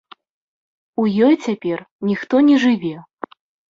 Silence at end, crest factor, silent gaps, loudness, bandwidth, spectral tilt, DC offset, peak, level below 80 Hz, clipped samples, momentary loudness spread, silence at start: 0.7 s; 14 dB; 1.91-1.99 s; -17 LUFS; 7.6 kHz; -6.5 dB/octave; under 0.1%; -4 dBFS; -62 dBFS; under 0.1%; 20 LU; 1 s